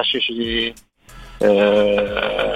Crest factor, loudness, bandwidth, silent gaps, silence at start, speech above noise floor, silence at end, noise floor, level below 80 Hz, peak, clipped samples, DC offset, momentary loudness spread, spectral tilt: 16 dB; -18 LUFS; 12 kHz; none; 0 s; 23 dB; 0 s; -41 dBFS; -42 dBFS; -2 dBFS; under 0.1%; 0.1%; 7 LU; -5 dB/octave